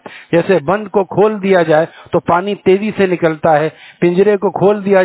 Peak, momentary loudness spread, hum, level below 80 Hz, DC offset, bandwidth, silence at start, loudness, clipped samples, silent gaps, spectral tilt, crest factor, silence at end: 0 dBFS; 5 LU; none; -52 dBFS; under 0.1%; 4 kHz; 0.05 s; -13 LUFS; under 0.1%; none; -11 dB/octave; 12 dB; 0 s